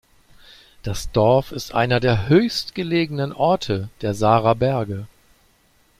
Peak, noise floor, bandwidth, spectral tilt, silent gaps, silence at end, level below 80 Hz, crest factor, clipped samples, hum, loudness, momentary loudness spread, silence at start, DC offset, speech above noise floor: -2 dBFS; -59 dBFS; 15.5 kHz; -6 dB/octave; none; 0.95 s; -44 dBFS; 18 dB; under 0.1%; none; -20 LUFS; 12 LU; 0.85 s; under 0.1%; 39 dB